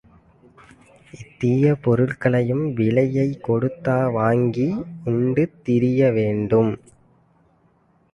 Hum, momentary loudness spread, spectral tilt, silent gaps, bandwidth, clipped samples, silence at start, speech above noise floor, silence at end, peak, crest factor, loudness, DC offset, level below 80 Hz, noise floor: none; 6 LU; -9.5 dB/octave; none; 9.8 kHz; under 0.1%; 1.15 s; 40 dB; 1.35 s; -4 dBFS; 16 dB; -20 LUFS; under 0.1%; -54 dBFS; -60 dBFS